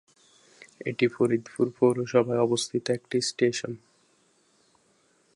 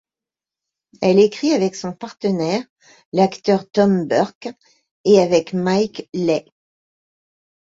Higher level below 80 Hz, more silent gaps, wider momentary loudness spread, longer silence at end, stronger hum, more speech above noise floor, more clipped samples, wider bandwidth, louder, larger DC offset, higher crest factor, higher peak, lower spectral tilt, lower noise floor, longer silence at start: second, -72 dBFS vs -60 dBFS; second, none vs 2.70-2.76 s, 3.05-3.12 s, 4.35-4.41 s, 4.91-5.04 s; about the same, 11 LU vs 10 LU; first, 1.6 s vs 1.25 s; neither; second, 40 dB vs 71 dB; neither; first, 11.5 kHz vs 7.8 kHz; second, -26 LUFS vs -18 LUFS; neither; about the same, 20 dB vs 18 dB; second, -8 dBFS vs -2 dBFS; about the same, -5 dB/octave vs -6 dB/octave; second, -66 dBFS vs -89 dBFS; second, 0.8 s vs 1 s